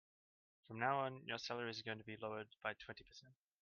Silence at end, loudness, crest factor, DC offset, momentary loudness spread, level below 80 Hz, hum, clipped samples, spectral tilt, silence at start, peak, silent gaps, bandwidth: 0.3 s; -45 LUFS; 22 dB; under 0.1%; 16 LU; -82 dBFS; none; under 0.1%; -2.5 dB/octave; 0.7 s; -24 dBFS; none; 7 kHz